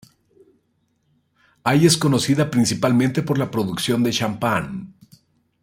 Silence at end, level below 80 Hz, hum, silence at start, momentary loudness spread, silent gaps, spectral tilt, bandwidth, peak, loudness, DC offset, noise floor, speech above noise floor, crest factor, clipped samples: 0.75 s; -56 dBFS; none; 1.65 s; 8 LU; none; -5 dB/octave; 16.5 kHz; -2 dBFS; -19 LUFS; under 0.1%; -67 dBFS; 48 dB; 20 dB; under 0.1%